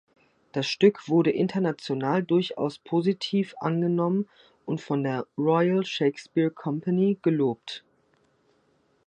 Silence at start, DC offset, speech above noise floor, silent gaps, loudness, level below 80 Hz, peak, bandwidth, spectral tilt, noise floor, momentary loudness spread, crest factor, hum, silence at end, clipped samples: 0.55 s; under 0.1%; 42 dB; none; -26 LUFS; -74 dBFS; -8 dBFS; 9.4 kHz; -7 dB/octave; -67 dBFS; 10 LU; 18 dB; none; 1.3 s; under 0.1%